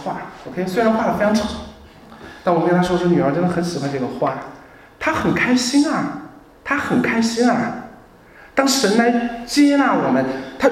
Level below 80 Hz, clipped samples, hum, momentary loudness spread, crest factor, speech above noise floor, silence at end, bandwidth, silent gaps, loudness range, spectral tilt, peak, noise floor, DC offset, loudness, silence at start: -48 dBFS; under 0.1%; none; 14 LU; 18 dB; 27 dB; 0 s; 15.5 kHz; none; 3 LU; -5 dB/octave; -2 dBFS; -45 dBFS; under 0.1%; -18 LUFS; 0 s